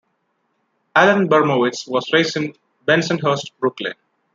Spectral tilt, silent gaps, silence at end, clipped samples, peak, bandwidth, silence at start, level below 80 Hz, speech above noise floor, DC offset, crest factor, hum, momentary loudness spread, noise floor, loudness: -5 dB/octave; none; 0.4 s; under 0.1%; -2 dBFS; 7.6 kHz; 0.95 s; -66 dBFS; 52 dB; under 0.1%; 18 dB; none; 12 LU; -69 dBFS; -18 LUFS